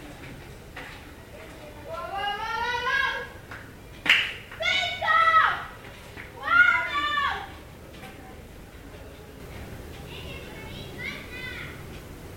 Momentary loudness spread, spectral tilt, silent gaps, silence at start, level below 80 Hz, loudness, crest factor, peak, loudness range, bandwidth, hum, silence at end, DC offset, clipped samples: 24 LU; -3 dB/octave; none; 0 s; -50 dBFS; -24 LUFS; 24 dB; -4 dBFS; 17 LU; 17 kHz; none; 0 s; under 0.1%; under 0.1%